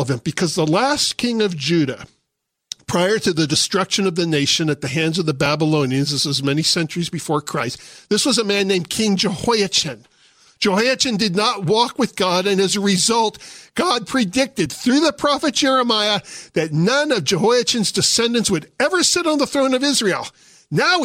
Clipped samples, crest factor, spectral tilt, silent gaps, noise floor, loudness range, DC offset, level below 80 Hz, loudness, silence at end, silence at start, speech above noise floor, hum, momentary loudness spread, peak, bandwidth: under 0.1%; 16 dB; -3.5 dB/octave; none; -76 dBFS; 2 LU; under 0.1%; -56 dBFS; -18 LUFS; 0 s; 0 s; 58 dB; none; 7 LU; -4 dBFS; 16 kHz